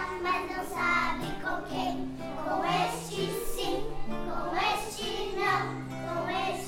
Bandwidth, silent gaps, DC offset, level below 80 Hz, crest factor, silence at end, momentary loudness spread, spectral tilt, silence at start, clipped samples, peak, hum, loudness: 16 kHz; none; under 0.1%; -44 dBFS; 16 dB; 0 s; 8 LU; -4 dB/octave; 0 s; under 0.1%; -14 dBFS; none; -31 LUFS